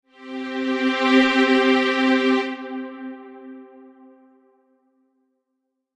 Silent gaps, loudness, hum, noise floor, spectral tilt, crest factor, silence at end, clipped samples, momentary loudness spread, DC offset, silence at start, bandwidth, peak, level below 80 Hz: none; -19 LUFS; none; -77 dBFS; -3.5 dB/octave; 18 dB; 2.3 s; under 0.1%; 22 LU; under 0.1%; 0.2 s; 9.2 kHz; -4 dBFS; -68 dBFS